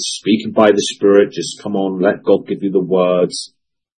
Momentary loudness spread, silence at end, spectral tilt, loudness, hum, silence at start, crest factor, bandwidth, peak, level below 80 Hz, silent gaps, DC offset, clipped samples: 9 LU; 0.55 s; -4.5 dB/octave; -15 LUFS; none; 0 s; 16 dB; 10 kHz; 0 dBFS; -62 dBFS; none; under 0.1%; under 0.1%